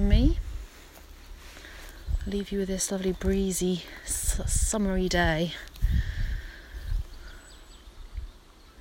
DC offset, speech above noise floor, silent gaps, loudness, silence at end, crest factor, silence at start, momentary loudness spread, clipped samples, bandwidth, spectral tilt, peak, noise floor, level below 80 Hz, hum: under 0.1%; 24 dB; none; -29 LUFS; 0 s; 20 dB; 0 s; 24 LU; under 0.1%; 16.5 kHz; -4.5 dB/octave; -8 dBFS; -51 dBFS; -32 dBFS; none